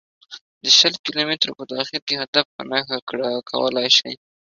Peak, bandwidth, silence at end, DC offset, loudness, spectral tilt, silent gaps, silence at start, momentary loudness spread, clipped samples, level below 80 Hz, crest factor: 0 dBFS; 7.6 kHz; 0.35 s; under 0.1%; -19 LUFS; -1.5 dB/octave; 0.41-0.61 s, 0.99-1.04 s, 2.02-2.07 s, 2.28-2.33 s, 2.45-2.59 s, 3.02-3.07 s; 0.3 s; 13 LU; under 0.1%; -68 dBFS; 22 dB